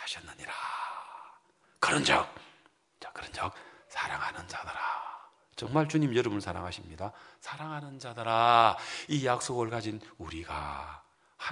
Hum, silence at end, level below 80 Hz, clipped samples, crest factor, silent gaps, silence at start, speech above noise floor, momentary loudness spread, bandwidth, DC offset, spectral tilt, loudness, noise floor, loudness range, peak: none; 0 s; -62 dBFS; under 0.1%; 26 dB; none; 0 s; 32 dB; 20 LU; 11 kHz; under 0.1%; -4.5 dB/octave; -31 LUFS; -64 dBFS; 5 LU; -8 dBFS